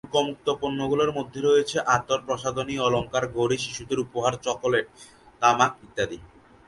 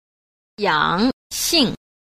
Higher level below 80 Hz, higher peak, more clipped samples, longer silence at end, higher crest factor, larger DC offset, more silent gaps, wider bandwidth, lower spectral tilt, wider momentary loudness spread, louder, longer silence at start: second, -54 dBFS vs -48 dBFS; about the same, -4 dBFS vs -2 dBFS; neither; about the same, 0.4 s vs 0.35 s; about the same, 20 dB vs 18 dB; neither; second, none vs 1.13-1.30 s; second, 11.5 kHz vs 15.5 kHz; about the same, -4 dB/octave vs -3 dB/octave; about the same, 7 LU vs 7 LU; second, -25 LUFS vs -19 LUFS; second, 0.05 s vs 0.6 s